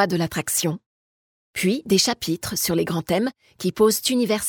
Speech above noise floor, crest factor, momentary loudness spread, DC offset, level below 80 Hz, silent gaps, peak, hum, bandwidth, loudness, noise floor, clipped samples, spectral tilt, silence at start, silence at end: over 68 dB; 18 dB; 9 LU; under 0.1%; -54 dBFS; 0.86-1.53 s; -4 dBFS; none; 19 kHz; -22 LUFS; under -90 dBFS; under 0.1%; -4 dB/octave; 0 s; 0 s